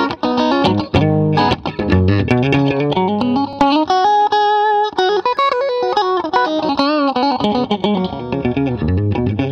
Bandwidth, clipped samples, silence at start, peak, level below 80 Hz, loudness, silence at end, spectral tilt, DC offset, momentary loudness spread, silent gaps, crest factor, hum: 8.4 kHz; under 0.1%; 0 s; -2 dBFS; -38 dBFS; -15 LUFS; 0 s; -7 dB/octave; under 0.1%; 5 LU; none; 12 dB; none